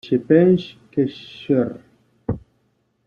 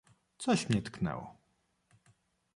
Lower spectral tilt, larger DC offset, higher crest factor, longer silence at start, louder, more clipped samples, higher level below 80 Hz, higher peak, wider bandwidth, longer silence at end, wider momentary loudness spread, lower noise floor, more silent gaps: first, -9.5 dB/octave vs -5.5 dB/octave; neither; about the same, 18 dB vs 20 dB; second, 0.05 s vs 0.4 s; first, -20 LUFS vs -34 LUFS; neither; first, -52 dBFS vs -62 dBFS; first, -2 dBFS vs -16 dBFS; second, 6.6 kHz vs 11.5 kHz; second, 0.7 s vs 1.25 s; first, 18 LU vs 13 LU; second, -66 dBFS vs -76 dBFS; neither